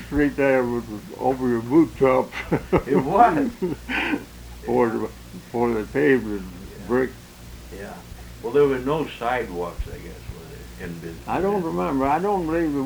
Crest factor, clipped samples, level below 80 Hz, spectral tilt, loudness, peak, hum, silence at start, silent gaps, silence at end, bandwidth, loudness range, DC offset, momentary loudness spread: 20 dB; under 0.1%; -42 dBFS; -7 dB/octave; -22 LUFS; -2 dBFS; none; 0 s; none; 0 s; over 20 kHz; 5 LU; under 0.1%; 19 LU